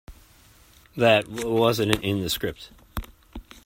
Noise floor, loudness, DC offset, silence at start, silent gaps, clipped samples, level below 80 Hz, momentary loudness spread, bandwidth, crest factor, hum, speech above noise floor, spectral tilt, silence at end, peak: -54 dBFS; -23 LUFS; under 0.1%; 0.1 s; none; under 0.1%; -46 dBFS; 24 LU; 16.5 kHz; 26 dB; none; 31 dB; -5 dB/octave; 0.25 s; 0 dBFS